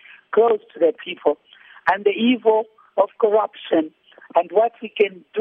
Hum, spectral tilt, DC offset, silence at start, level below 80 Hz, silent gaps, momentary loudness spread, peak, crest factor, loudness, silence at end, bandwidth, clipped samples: none; -7 dB/octave; under 0.1%; 0.3 s; -70 dBFS; none; 6 LU; -2 dBFS; 18 dB; -20 LUFS; 0 s; 4.5 kHz; under 0.1%